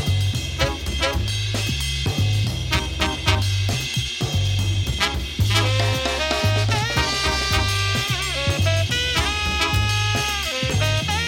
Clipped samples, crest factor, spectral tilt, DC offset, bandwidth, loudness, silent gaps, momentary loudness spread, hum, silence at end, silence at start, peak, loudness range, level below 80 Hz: under 0.1%; 20 dB; -3.5 dB/octave; under 0.1%; 17 kHz; -21 LUFS; none; 3 LU; none; 0 s; 0 s; 0 dBFS; 2 LU; -32 dBFS